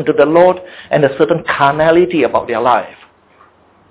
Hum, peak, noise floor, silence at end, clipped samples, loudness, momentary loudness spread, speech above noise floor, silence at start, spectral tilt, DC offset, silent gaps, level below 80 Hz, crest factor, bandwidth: none; 0 dBFS; -48 dBFS; 1 s; under 0.1%; -12 LUFS; 7 LU; 36 dB; 0 s; -10 dB/octave; under 0.1%; none; -48 dBFS; 14 dB; 4 kHz